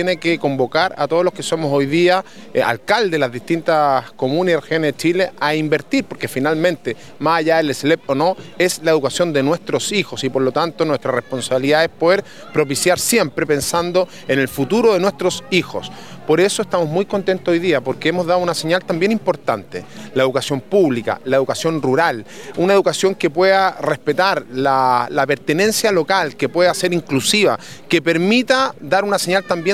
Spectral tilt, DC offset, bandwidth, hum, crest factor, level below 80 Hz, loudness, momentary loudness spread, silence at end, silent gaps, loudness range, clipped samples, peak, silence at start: -4.5 dB/octave; 0.6%; 16 kHz; none; 16 dB; -58 dBFS; -17 LUFS; 6 LU; 0 s; none; 2 LU; under 0.1%; 0 dBFS; 0 s